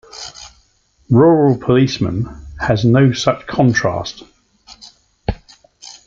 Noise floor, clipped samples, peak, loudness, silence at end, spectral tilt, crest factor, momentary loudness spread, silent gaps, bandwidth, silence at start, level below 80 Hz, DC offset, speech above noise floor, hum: -57 dBFS; under 0.1%; -2 dBFS; -15 LUFS; 0.15 s; -6.5 dB/octave; 16 dB; 20 LU; none; 7.6 kHz; 0.15 s; -38 dBFS; under 0.1%; 43 dB; none